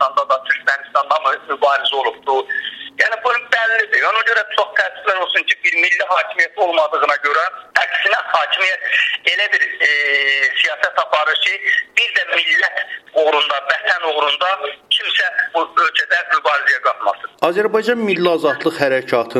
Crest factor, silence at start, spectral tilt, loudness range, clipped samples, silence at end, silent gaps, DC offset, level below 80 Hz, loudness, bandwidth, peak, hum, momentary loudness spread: 16 dB; 0 s; -2.5 dB/octave; 2 LU; under 0.1%; 0 s; none; under 0.1%; -68 dBFS; -15 LUFS; 13 kHz; 0 dBFS; none; 5 LU